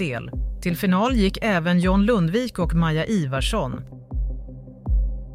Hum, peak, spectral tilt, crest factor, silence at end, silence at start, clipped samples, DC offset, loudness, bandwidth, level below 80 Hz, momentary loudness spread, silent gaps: none; -8 dBFS; -6.5 dB/octave; 14 dB; 0 s; 0 s; under 0.1%; under 0.1%; -22 LUFS; 16 kHz; -28 dBFS; 13 LU; none